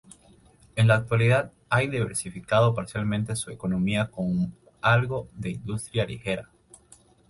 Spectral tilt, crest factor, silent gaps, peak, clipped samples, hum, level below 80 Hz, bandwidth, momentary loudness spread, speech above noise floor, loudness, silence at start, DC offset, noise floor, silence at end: -6 dB/octave; 18 dB; none; -8 dBFS; under 0.1%; none; -52 dBFS; 11.5 kHz; 11 LU; 32 dB; -26 LUFS; 0.75 s; under 0.1%; -56 dBFS; 0.85 s